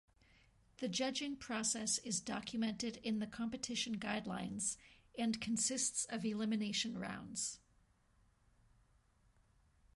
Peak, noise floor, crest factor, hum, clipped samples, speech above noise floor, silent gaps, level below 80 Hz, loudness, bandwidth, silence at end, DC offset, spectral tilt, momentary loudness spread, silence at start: -24 dBFS; -73 dBFS; 18 dB; none; under 0.1%; 33 dB; none; -72 dBFS; -40 LUFS; 11.5 kHz; 2.4 s; under 0.1%; -2.5 dB/octave; 7 LU; 0.8 s